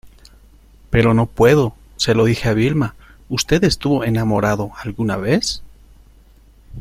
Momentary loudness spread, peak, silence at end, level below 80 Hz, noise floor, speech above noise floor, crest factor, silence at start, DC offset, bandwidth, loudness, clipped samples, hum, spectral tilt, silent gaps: 10 LU; -2 dBFS; 0 s; -38 dBFS; -47 dBFS; 31 dB; 16 dB; 0.05 s; under 0.1%; 15.5 kHz; -17 LUFS; under 0.1%; none; -5.5 dB/octave; none